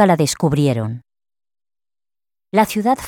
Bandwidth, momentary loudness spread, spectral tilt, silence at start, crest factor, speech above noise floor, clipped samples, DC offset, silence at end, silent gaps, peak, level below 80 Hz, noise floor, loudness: 18.5 kHz; 10 LU; -5.5 dB/octave; 0 s; 18 dB; over 74 dB; under 0.1%; under 0.1%; 0 s; none; -2 dBFS; -50 dBFS; under -90 dBFS; -18 LUFS